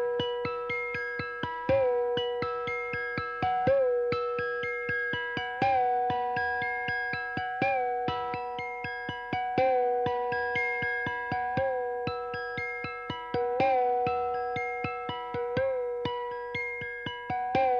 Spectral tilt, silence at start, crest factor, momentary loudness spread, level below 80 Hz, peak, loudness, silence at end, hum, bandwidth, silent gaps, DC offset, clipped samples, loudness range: -6.5 dB/octave; 0 s; 16 dB; 8 LU; -60 dBFS; -14 dBFS; -30 LUFS; 0 s; none; 6.8 kHz; none; under 0.1%; under 0.1%; 2 LU